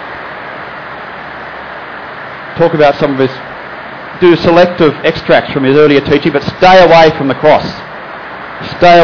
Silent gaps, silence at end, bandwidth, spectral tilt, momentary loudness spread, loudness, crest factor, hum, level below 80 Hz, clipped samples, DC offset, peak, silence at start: none; 0 s; 5.4 kHz; -6.5 dB/octave; 18 LU; -8 LUFS; 10 dB; none; -38 dBFS; 0.7%; under 0.1%; 0 dBFS; 0 s